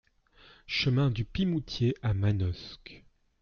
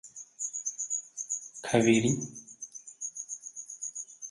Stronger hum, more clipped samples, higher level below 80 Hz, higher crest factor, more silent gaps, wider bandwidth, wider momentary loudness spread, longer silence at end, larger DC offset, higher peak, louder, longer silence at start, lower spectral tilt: neither; neither; first, -50 dBFS vs -66 dBFS; second, 14 dB vs 24 dB; neither; second, 7 kHz vs 11.5 kHz; about the same, 16 LU vs 18 LU; first, 0.45 s vs 0 s; neither; second, -16 dBFS vs -8 dBFS; about the same, -30 LUFS vs -31 LUFS; first, 0.7 s vs 0.05 s; first, -7 dB/octave vs -4 dB/octave